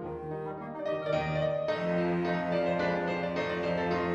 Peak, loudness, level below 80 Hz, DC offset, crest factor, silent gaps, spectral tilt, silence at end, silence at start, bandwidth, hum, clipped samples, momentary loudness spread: -18 dBFS; -31 LUFS; -58 dBFS; under 0.1%; 14 dB; none; -7.5 dB/octave; 0 s; 0 s; 7.8 kHz; none; under 0.1%; 8 LU